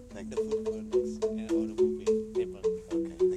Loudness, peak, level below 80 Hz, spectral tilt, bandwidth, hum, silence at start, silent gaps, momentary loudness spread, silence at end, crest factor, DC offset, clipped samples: -31 LUFS; -16 dBFS; -54 dBFS; -6.5 dB/octave; 10.5 kHz; none; 0 s; none; 6 LU; 0 s; 14 dB; under 0.1%; under 0.1%